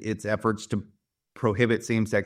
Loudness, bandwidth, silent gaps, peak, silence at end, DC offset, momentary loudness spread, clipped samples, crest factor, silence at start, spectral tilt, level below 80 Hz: -27 LUFS; 14.5 kHz; none; -6 dBFS; 0 s; under 0.1%; 9 LU; under 0.1%; 20 dB; 0 s; -6 dB/octave; -60 dBFS